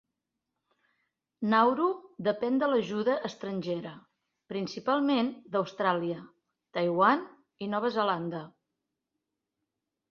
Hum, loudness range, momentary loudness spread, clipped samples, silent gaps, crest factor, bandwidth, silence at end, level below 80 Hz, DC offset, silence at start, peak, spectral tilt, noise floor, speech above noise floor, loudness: none; 2 LU; 13 LU; under 0.1%; none; 22 dB; 7 kHz; 1.6 s; -76 dBFS; under 0.1%; 1.4 s; -8 dBFS; -6.5 dB/octave; -86 dBFS; 57 dB; -29 LUFS